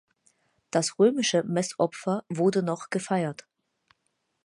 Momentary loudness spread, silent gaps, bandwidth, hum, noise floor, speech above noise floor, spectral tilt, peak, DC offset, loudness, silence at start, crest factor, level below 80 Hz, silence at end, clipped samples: 8 LU; none; 11.5 kHz; none; -77 dBFS; 51 dB; -4.5 dB/octave; -10 dBFS; under 0.1%; -26 LUFS; 0.75 s; 18 dB; -76 dBFS; 1.1 s; under 0.1%